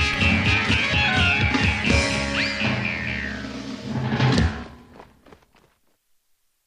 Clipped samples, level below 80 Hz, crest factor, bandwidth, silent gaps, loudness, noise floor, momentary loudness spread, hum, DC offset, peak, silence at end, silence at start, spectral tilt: under 0.1%; -34 dBFS; 16 dB; 11.5 kHz; none; -21 LUFS; -67 dBFS; 13 LU; none; under 0.1%; -6 dBFS; 1.6 s; 0 s; -4.5 dB/octave